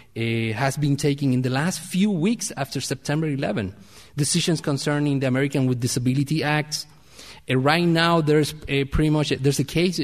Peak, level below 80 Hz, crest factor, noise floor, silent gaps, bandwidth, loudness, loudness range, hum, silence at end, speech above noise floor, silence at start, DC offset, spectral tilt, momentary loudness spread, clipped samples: -4 dBFS; -44 dBFS; 20 dB; -45 dBFS; none; 15 kHz; -22 LUFS; 3 LU; none; 0 s; 23 dB; 0.15 s; 0.2%; -5 dB/octave; 8 LU; under 0.1%